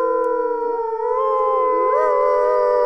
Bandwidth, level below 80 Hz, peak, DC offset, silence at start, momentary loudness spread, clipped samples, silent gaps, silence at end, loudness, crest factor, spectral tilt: 6 kHz; -54 dBFS; -6 dBFS; 0.4%; 0 s; 5 LU; under 0.1%; none; 0 s; -18 LUFS; 12 dB; -5 dB/octave